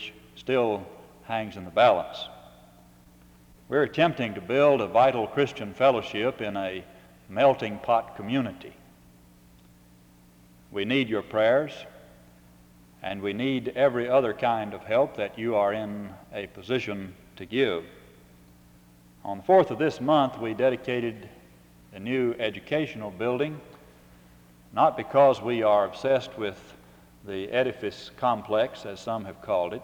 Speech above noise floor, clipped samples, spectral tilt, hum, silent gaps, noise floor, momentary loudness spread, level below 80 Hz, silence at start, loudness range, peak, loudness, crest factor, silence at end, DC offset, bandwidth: 30 dB; under 0.1%; -6.5 dB/octave; 60 Hz at -65 dBFS; none; -55 dBFS; 16 LU; -62 dBFS; 0 s; 6 LU; -8 dBFS; -26 LUFS; 20 dB; 0 s; under 0.1%; 19.5 kHz